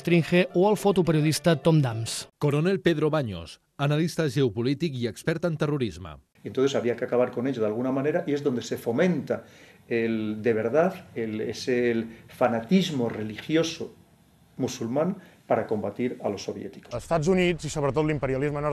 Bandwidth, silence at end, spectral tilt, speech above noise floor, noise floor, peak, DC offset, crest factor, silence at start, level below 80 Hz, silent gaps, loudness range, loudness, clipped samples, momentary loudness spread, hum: 13 kHz; 0 s; -6 dB/octave; 33 dB; -58 dBFS; -8 dBFS; under 0.1%; 18 dB; 0 s; -54 dBFS; none; 4 LU; -26 LUFS; under 0.1%; 11 LU; none